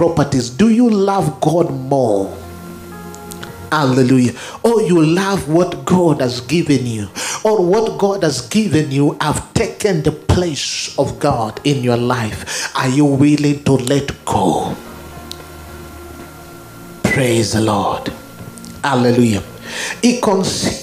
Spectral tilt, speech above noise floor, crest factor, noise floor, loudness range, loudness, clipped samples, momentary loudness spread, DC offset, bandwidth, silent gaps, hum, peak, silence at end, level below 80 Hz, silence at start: -5.5 dB/octave; 20 dB; 16 dB; -35 dBFS; 5 LU; -15 LUFS; under 0.1%; 19 LU; under 0.1%; 16 kHz; none; none; 0 dBFS; 0 s; -42 dBFS; 0 s